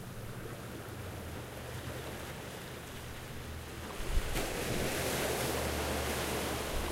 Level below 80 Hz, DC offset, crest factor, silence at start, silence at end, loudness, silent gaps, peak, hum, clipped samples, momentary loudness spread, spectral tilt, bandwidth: -44 dBFS; under 0.1%; 18 dB; 0 s; 0 s; -38 LUFS; none; -18 dBFS; none; under 0.1%; 11 LU; -4 dB/octave; 16 kHz